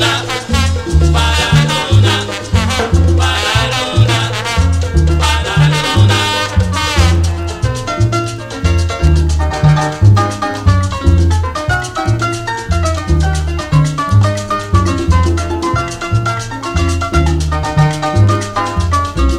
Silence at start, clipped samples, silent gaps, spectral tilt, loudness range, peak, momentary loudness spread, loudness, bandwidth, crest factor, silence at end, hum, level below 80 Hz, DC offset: 0 s; under 0.1%; none; -5 dB/octave; 2 LU; 0 dBFS; 6 LU; -13 LUFS; 13.5 kHz; 12 dB; 0 s; none; -18 dBFS; under 0.1%